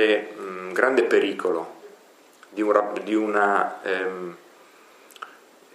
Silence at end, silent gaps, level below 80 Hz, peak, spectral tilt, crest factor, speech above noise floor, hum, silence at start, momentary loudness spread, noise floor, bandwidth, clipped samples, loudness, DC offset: 0.45 s; none; -84 dBFS; -2 dBFS; -4.5 dB/octave; 22 dB; 30 dB; none; 0 s; 18 LU; -52 dBFS; 13.5 kHz; under 0.1%; -23 LUFS; under 0.1%